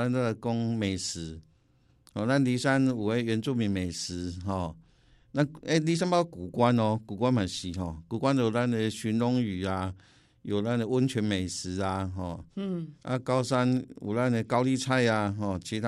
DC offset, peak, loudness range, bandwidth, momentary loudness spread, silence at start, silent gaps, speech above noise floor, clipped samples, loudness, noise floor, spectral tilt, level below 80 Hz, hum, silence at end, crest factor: under 0.1%; -10 dBFS; 3 LU; 12.5 kHz; 10 LU; 0 s; none; 37 dB; under 0.1%; -29 LUFS; -65 dBFS; -6 dB/octave; -58 dBFS; none; 0 s; 18 dB